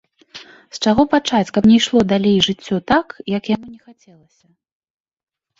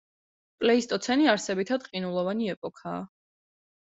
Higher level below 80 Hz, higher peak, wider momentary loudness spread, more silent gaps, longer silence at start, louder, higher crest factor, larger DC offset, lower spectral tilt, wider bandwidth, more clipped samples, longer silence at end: first, -48 dBFS vs -70 dBFS; first, -2 dBFS vs -8 dBFS; second, 11 LU vs 14 LU; second, none vs 2.57-2.62 s; second, 0.35 s vs 0.6 s; first, -16 LUFS vs -27 LUFS; second, 16 dB vs 22 dB; neither; about the same, -5 dB/octave vs -4.5 dB/octave; about the same, 7.8 kHz vs 8.2 kHz; neither; first, 1.85 s vs 0.9 s